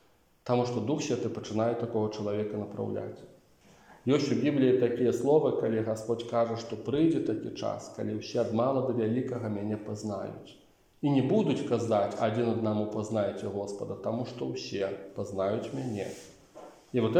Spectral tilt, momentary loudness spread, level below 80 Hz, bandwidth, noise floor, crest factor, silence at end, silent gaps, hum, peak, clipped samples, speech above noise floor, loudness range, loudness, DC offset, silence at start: -7 dB/octave; 11 LU; -68 dBFS; 15 kHz; -59 dBFS; 18 dB; 0 s; none; none; -12 dBFS; under 0.1%; 30 dB; 6 LU; -30 LUFS; under 0.1%; 0.45 s